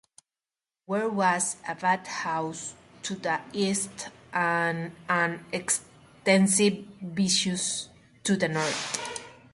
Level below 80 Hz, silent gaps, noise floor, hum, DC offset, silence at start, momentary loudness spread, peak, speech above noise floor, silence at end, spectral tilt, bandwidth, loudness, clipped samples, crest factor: -68 dBFS; none; under -90 dBFS; none; under 0.1%; 0.9 s; 13 LU; -6 dBFS; over 63 dB; 0.2 s; -3.5 dB/octave; 11.5 kHz; -27 LUFS; under 0.1%; 22 dB